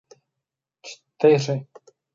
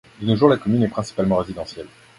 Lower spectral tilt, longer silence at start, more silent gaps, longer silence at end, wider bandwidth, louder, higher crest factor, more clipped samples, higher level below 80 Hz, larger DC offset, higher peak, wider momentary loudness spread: second, -6 dB/octave vs -7.5 dB/octave; first, 0.85 s vs 0.2 s; neither; first, 0.5 s vs 0.3 s; second, 7.6 kHz vs 11.5 kHz; about the same, -21 LUFS vs -20 LUFS; about the same, 22 dB vs 20 dB; neither; second, -78 dBFS vs -48 dBFS; neither; second, -4 dBFS vs 0 dBFS; first, 23 LU vs 16 LU